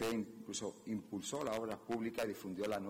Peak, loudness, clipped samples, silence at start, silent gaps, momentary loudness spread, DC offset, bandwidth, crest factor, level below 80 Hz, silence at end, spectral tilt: -28 dBFS; -42 LUFS; under 0.1%; 0 s; none; 4 LU; under 0.1%; 16 kHz; 14 dB; -72 dBFS; 0 s; -4 dB/octave